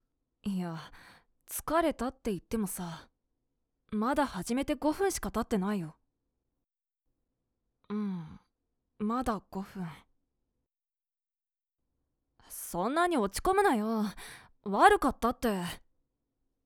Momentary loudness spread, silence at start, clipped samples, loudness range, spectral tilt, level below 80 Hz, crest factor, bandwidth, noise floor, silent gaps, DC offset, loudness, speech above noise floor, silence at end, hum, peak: 17 LU; 0.45 s; under 0.1%; 12 LU; -5 dB/octave; -54 dBFS; 26 dB; over 20 kHz; under -90 dBFS; none; under 0.1%; -31 LUFS; over 59 dB; 0.9 s; none; -8 dBFS